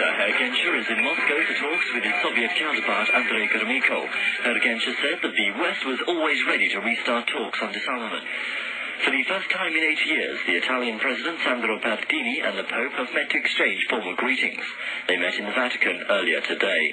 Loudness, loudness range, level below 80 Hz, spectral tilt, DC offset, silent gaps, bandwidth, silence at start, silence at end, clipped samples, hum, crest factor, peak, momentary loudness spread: -22 LUFS; 3 LU; -78 dBFS; -2.5 dB/octave; under 0.1%; none; 9.4 kHz; 0 s; 0 s; under 0.1%; none; 18 dB; -6 dBFS; 6 LU